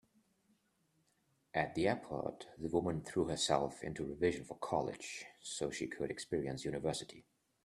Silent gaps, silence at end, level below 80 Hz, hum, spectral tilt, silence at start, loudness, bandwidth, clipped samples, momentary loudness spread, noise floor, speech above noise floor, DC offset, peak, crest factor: none; 0.45 s; -66 dBFS; none; -4.5 dB/octave; 1.55 s; -39 LUFS; 13.5 kHz; under 0.1%; 10 LU; -78 dBFS; 39 dB; under 0.1%; -16 dBFS; 24 dB